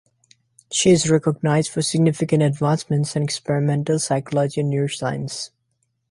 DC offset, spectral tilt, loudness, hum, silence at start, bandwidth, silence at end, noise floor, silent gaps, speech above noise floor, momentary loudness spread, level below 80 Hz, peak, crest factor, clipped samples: under 0.1%; -5.5 dB/octave; -20 LUFS; none; 0.7 s; 11.5 kHz; 0.65 s; -71 dBFS; none; 51 dB; 9 LU; -56 dBFS; -4 dBFS; 18 dB; under 0.1%